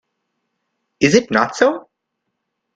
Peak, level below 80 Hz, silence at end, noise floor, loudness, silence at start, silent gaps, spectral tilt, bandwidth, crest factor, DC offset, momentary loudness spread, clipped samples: 0 dBFS; -56 dBFS; 0.95 s; -76 dBFS; -16 LUFS; 1 s; none; -4.5 dB/octave; 9.2 kHz; 20 dB; under 0.1%; 4 LU; under 0.1%